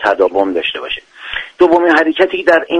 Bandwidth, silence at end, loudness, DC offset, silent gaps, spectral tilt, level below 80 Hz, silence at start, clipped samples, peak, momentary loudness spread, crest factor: 9 kHz; 0 s; -13 LUFS; under 0.1%; none; -4.5 dB/octave; -48 dBFS; 0 s; under 0.1%; 0 dBFS; 13 LU; 12 dB